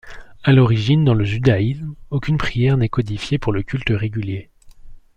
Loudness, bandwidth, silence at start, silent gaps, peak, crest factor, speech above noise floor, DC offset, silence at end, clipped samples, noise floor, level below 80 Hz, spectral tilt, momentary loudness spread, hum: -19 LUFS; 8.6 kHz; 0.05 s; none; -2 dBFS; 16 dB; 21 dB; under 0.1%; 0.2 s; under 0.1%; -38 dBFS; -38 dBFS; -8 dB/octave; 11 LU; none